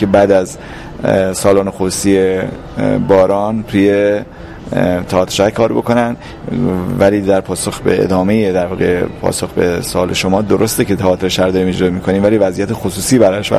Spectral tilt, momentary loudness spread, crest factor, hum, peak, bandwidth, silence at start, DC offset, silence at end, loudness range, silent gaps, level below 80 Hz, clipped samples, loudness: -5.5 dB/octave; 8 LU; 12 dB; none; 0 dBFS; 15.5 kHz; 0 s; under 0.1%; 0 s; 1 LU; none; -36 dBFS; under 0.1%; -13 LUFS